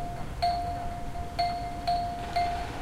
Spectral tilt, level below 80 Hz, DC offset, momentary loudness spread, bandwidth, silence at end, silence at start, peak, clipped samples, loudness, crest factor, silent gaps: -5 dB/octave; -40 dBFS; under 0.1%; 7 LU; 16 kHz; 0 s; 0 s; -16 dBFS; under 0.1%; -32 LUFS; 14 dB; none